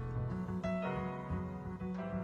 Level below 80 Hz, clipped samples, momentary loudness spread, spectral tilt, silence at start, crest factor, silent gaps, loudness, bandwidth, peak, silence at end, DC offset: -52 dBFS; under 0.1%; 5 LU; -9 dB/octave; 0 s; 12 dB; none; -40 LUFS; 7.4 kHz; -26 dBFS; 0 s; under 0.1%